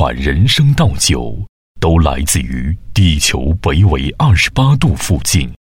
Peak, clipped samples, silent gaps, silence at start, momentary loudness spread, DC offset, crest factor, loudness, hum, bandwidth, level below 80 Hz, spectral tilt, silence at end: 0 dBFS; under 0.1%; 1.49-1.75 s; 0 s; 8 LU; under 0.1%; 12 dB; -13 LUFS; none; 16.5 kHz; -22 dBFS; -4.5 dB/octave; 0.1 s